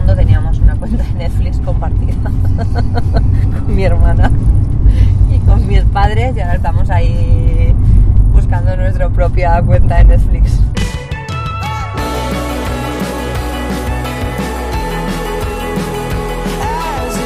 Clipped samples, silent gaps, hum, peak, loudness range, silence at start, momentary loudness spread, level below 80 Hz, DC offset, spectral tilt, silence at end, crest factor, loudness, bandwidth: 0.6%; none; none; 0 dBFS; 7 LU; 0 s; 8 LU; -14 dBFS; under 0.1%; -7 dB/octave; 0 s; 10 dB; -14 LUFS; 14 kHz